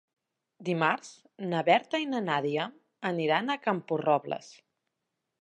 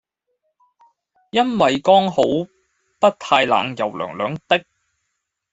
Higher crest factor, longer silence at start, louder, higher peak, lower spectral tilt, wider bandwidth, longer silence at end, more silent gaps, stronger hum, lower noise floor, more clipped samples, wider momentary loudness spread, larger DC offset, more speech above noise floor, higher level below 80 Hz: about the same, 22 dB vs 18 dB; second, 0.6 s vs 1.35 s; second, -29 LUFS vs -18 LUFS; second, -10 dBFS vs -2 dBFS; about the same, -5.5 dB/octave vs -5 dB/octave; first, 10.5 kHz vs 8.2 kHz; about the same, 0.9 s vs 0.9 s; neither; neither; first, -84 dBFS vs -76 dBFS; neither; first, 13 LU vs 10 LU; neither; about the same, 55 dB vs 58 dB; second, -84 dBFS vs -60 dBFS